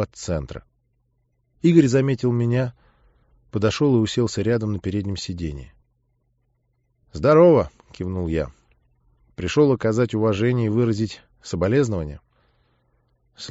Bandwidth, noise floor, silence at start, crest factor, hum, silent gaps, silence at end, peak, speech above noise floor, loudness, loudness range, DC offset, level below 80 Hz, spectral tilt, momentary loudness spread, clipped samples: 8 kHz; -68 dBFS; 0 s; 20 dB; none; none; 0 s; -2 dBFS; 48 dB; -21 LUFS; 4 LU; under 0.1%; -44 dBFS; -7 dB/octave; 17 LU; under 0.1%